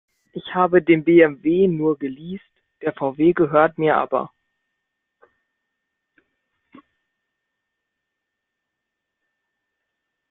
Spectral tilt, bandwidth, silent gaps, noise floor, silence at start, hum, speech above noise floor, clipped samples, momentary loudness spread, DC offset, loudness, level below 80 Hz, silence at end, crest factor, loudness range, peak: -10.5 dB/octave; 3.9 kHz; none; -81 dBFS; 0.35 s; none; 63 dB; under 0.1%; 20 LU; under 0.1%; -18 LUFS; -62 dBFS; 6.05 s; 22 dB; 9 LU; -2 dBFS